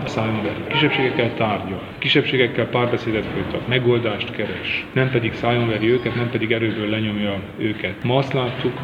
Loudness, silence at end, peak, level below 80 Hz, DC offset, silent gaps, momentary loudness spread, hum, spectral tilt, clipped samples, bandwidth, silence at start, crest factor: -21 LUFS; 0 s; -2 dBFS; -48 dBFS; under 0.1%; none; 7 LU; none; -7 dB/octave; under 0.1%; 7.6 kHz; 0 s; 18 dB